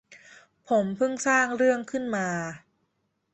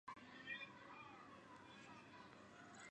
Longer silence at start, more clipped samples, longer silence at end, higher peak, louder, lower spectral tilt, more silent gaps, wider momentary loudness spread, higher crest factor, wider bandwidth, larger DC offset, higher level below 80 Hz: about the same, 0.1 s vs 0.05 s; neither; first, 0.75 s vs 0 s; first, -8 dBFS vs -38 dBFS; first, -26 LUFS vs -57 LUFS; about the same, -4.5 dB/octave vs -3.5 dB/octave; neither; about the same, 10 LU vs 10 LU; about the same, 20 dB vs 20 dB; second, 8.6 kHz vs 10 kHz; neither; first, -70 dBFS vs -86 dBFS